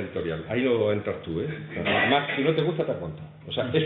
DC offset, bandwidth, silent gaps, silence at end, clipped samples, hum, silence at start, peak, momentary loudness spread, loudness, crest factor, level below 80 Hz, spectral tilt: under 0.1%; 4.4 kHz; none; 0 s; under 0.1%; none; 0 s; -8 dBFS; 11 LU; -26 LUFS; 18 dB; -56 dBFS; -10 dB/octave